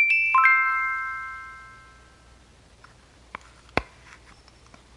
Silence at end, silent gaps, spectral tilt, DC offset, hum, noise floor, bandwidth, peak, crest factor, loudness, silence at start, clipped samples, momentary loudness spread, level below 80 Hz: 1.15 s; none; -4 dB/octave; under 0.1%; none; -54 dBFS; 11.5 kHz; -4 dBFS; 22 dB; -21 LUFS; 0 s; under 0.1%; 26 LU; -54 dBFS